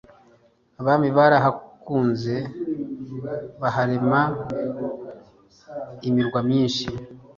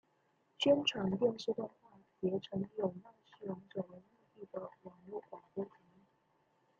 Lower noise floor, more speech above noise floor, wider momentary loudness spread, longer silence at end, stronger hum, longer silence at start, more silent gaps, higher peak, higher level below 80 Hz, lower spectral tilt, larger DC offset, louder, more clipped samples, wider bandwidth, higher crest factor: second, -58 dBFS vs -76 dBFS; about the same, 37 dB vs 38 dB; about the same, 19 LU vs 17 LU; second, 0.15 s vs 1.1 s; neither; first, 0.8 s vs 0.6 s; neither; first, -4 dBFS vs -18 dBFS; first, -56 dBFS vs -78 dBFS; first, -7 dB/octave vs -4 dB/octave; neither; first, -23 LUFS vs -38 LUFS; neither; about the same, 7.4 kHz vs 7.6 kHz; about the same, 20 dB vs 22 dB